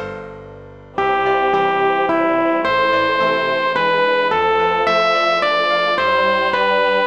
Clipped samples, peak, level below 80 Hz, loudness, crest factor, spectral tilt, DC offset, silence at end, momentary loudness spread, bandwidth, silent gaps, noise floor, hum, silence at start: under 0.1%; -4 dBFS; -52 dBFS; -16 LUFS; 14 dB; -4.5 dB/octave; 0.3%; 0 s; 3 LU; 9 kHz; none; -37 dBFS; none; 0 s